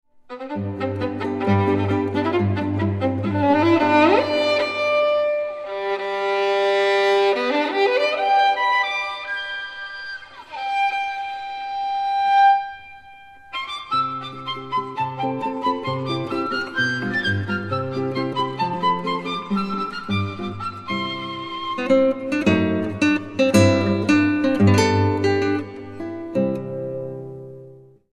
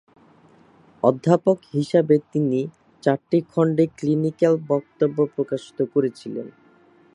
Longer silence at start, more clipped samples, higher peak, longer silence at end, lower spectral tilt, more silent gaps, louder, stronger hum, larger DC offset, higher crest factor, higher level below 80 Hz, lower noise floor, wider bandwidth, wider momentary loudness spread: second, 0.3 s vs 1.05 s; neither; about the same, -2 dBFS vs -2 dBFS; second, 0.35 s vs 0.65 s; second, -6 dB/octave vs -8.5 dB/octave; neither; about the same, -21 LUFS vs -22 LUFS; neither; neither; about the same, 18 dB vs 20 dB; first, -58 dBFS vs -68 dBFS; second, -45 dBFS vs -54 dBFS; first, 13.5 kHz vs 10.5 kHz; first, 13 LU vs 9 LU